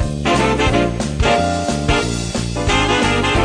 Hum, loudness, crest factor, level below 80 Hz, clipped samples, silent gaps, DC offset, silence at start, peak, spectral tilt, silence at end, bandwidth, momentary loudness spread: none; -16 LUFS; 14 dB; -26 dBFS; under 0.1%; none; under 0.1%; 0 s; -2 dBFS; -4.5 dB/octave; 0 s; 10 kHz; 5 LU